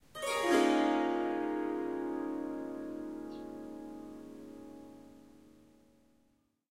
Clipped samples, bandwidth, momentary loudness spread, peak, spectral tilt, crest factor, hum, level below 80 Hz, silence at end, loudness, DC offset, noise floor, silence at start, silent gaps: under 0.1%; 16 kHz; 21 LU; -16 dBFS; -3.5 dB/octave; 20 dB; none; -72 dBFS; 1.2 s; -34 LUFS; under 0.1%; -74 dBFS; 0.15 s; none